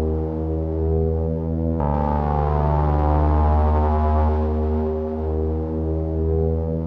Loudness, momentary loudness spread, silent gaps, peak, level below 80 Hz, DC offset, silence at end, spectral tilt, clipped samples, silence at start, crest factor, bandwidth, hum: -21 LUFS; 6 LU; none; -6 dBFS; -24 dBFS; under 0.1%; 0 s; -11.5 dB/octave; under 0.1%; 0 s; 14 dB; 3.4 kHz; none